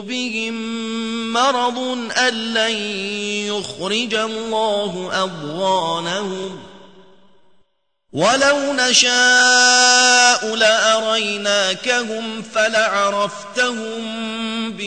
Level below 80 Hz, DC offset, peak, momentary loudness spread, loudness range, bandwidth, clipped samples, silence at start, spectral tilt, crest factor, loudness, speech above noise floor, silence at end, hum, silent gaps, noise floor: -62 dBFS; 0.3%; 0 dBFS; 14 LU; 10 LU; 9.6 kHz; under 0.1%; 0 s; -1 dB/octave; 18 dB; -16 LUFS; 46 dB; 0 s; none; none; -64 dBFS